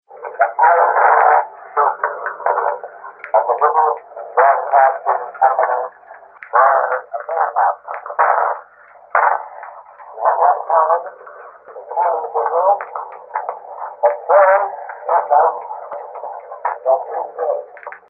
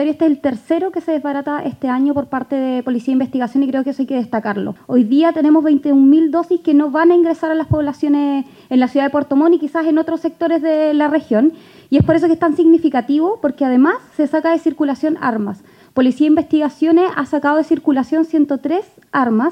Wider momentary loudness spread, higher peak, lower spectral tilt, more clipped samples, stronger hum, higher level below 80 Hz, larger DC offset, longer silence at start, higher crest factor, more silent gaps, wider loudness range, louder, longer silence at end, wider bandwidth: first, 18 LU vs 8 LU; about the same, 0 dBFS vs 0 dBFS; about the same, -7 dB/octave vs -8 dB/octave; neither; neither; second, -78 dBFS vs -48 dBFS; neither; about the same, 0.1 s vs 0 s; about the same, 16 dB vs 14 dB; neither; about the same, 3 LU vs 5 LU; about the same, -16 LUFS vs -15 LUFS; first, 0.15 s vs 0 s; second, 2.8 kHz vs 8.4 kHz